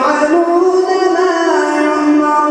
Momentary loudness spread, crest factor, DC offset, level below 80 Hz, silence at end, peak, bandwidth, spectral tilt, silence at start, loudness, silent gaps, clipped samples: 2 LU; 12 dB; under 0.1%; -58 dBFS; 0 s; 0 dBFS; 10.5 kHz; -3 dB/octave; 0 s; -12 LUFS; none; under 0.1%